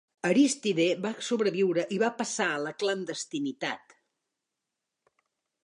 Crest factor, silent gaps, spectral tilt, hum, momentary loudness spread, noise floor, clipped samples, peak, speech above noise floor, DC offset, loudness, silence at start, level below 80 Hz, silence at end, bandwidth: 18 dB; none; -4 dB/octave; none; 10 LU; -86 dBFS; under 0.1%; -12 dBFS; 58 dB; under 0.1%; -28 LUFS; 0.25 s; -82 dBFS; 1.85 s; 11 kHz